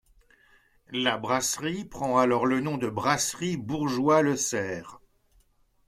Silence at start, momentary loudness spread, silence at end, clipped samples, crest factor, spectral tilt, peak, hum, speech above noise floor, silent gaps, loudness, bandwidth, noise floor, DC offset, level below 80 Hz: 0.9 s; 10 LU; 0.9 s; under 0.1%; 20 dB; -4 dB/octave; -8 dBFS; none; 38 dB; none; -26 LUFS; 16 kHz; -64 dBFS; under 0.1%; -60 dBFS